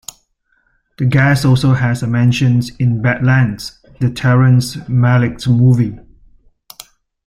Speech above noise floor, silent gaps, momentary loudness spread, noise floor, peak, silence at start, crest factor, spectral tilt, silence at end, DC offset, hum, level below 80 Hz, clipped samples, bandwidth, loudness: 49 dB; none; 8 LU; -61 dBFS; 0 dBFS; 1 s; 14 dB; -7 dB/octave; 1.25 s; under 0.1%; none; -42 dBFS; under 0.1%; 14 kHz; -14 LUFS